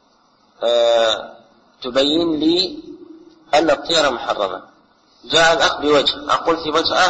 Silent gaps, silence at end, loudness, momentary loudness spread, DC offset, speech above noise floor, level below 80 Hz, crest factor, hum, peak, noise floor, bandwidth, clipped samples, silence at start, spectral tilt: none; 0 s; -17 LUFS; 10 LU; under 0.1%; 40 dB; -50 dBFS; 16 dB; none; -4 dBFS; -56 dBFS; 8.8 kHz; under 0.1%; 0.6 s; -2.5 dB/octave